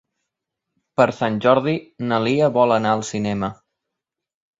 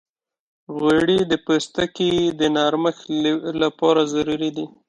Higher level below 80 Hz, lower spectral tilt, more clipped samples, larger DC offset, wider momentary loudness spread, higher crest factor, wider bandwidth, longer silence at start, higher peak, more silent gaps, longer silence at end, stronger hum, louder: about the same, -58 dBFS vs -54 dBFS; about the same, -6 dB/octave vs -5 dB/octave; neither; neither; first, 9 LU vs 5 LU; about the same, 20 dB vs 16 dB; second, 7.8 kHz vs 11 kHz; first, 1 s vs 0.7 s; about the same, -2 dBFS vs -4 dBFS; neither; first, 1.05 s vs 0.2 s; neither; about the same, -20 LUFS vs -20 LUFS